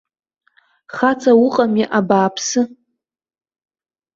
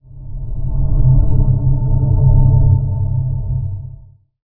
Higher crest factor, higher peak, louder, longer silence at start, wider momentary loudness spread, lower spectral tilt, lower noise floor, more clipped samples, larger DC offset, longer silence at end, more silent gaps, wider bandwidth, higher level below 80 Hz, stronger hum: about the same, 16 dB vs 14 dB; about the same, -2 dBFS vs 0 dBFS; about the same, -16 LUFS vs -16 LUFS; first, 0.95 s vs 0.1 s; second, 8 LU vs 16 LU; second, -4.5 dB/octave vs -16.5 dB/octave; first, -73 dBFS vs -40 dBFS; neither; neither; first, 1.45 s vs 0.5 s; neither; first, 7.8 kHz vs 1.4 kHz; second, -62 dBFS vs -18 dBFS; neither